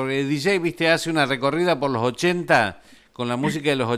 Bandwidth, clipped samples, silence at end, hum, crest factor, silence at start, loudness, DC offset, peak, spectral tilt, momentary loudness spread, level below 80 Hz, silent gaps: 15.5 kHz; under 0.1%; 0 s; none; 18 dB; 0 s; -21 LUFS; under 0.1%; -4 dBFS; -5 dB/octave; 5 LU; -60 dBFS; none